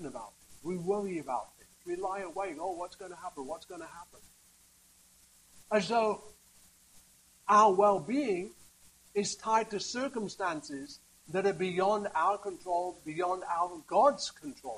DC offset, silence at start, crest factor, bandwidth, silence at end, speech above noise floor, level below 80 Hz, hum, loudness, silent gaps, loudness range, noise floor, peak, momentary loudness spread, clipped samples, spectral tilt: under 0.1%; 0 s; 20 dB; 15 kHz; 0 s; 31 dB; -70 dBFS; none; -32 LUFS; none; 11 LU; -63 dBFS; -12 dBFS; 18 LU; under 0.1%; -4.5 dB/octave